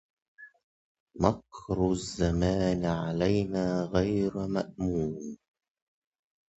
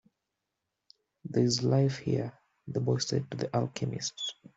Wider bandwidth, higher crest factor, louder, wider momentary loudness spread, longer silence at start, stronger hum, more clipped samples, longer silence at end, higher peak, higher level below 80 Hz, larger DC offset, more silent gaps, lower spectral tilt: about the same, 8.2 kHz vs 8 kHz; first, 24 dB vs 18 dB; about the same, -29 LUFS vs -31 LUFS; about the same, 8 LU vs 10 LU; second, 0.4 s vs 1.25 s; neither; neither; first, 1.2 s vs 0.25 s; first, -6 dBFS vs -14 dBFS; first, -46 dBFS vs -66 dBFS; neither; first, 0.64-1.07 s vs none; first, -7 dB/octave vs -5.5 dB/octave